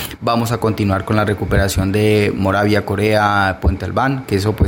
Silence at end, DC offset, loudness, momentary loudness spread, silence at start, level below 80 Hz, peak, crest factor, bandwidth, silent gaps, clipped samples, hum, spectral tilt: 0 s; under 0.1%; -16 LUFS; 4 LU; 0 s; -30 dBFS; -2 dBFS; 14 dB; 17 kHz; none; under 0.1%; none; -6 dB/octave